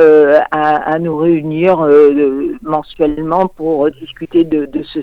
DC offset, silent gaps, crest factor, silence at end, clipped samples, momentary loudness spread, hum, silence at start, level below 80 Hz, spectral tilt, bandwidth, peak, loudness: under 0.1%; none; 10 dB; 0 s; under 0.1%; 10 LU; none; 0 s; -44 dBFS; -8.5 dB/octave; 4.8 kHz; 0 dBFS; -12 LUFS